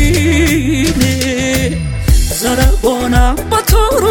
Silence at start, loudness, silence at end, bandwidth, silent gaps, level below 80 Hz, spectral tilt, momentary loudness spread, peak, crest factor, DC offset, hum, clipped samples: 0 s; -12 LUFS; 0 s; 17.5 kHz; none; -16 dBFS; -5 dB/octave; 3 LU; 0 dBFS; 10 dB; under 0.1%; none; under 0.1%